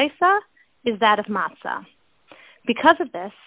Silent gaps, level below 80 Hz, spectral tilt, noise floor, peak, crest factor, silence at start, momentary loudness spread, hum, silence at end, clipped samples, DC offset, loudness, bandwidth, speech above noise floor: none; -64 dBFS; -8 dB/octave; -51 dBFS; -2 dBFS; 20 dB; 0 s; 14 LU; none; 0.15 s; under 0.1%; under 0.1%; -21 LUFS; 4 kHz; 31 dB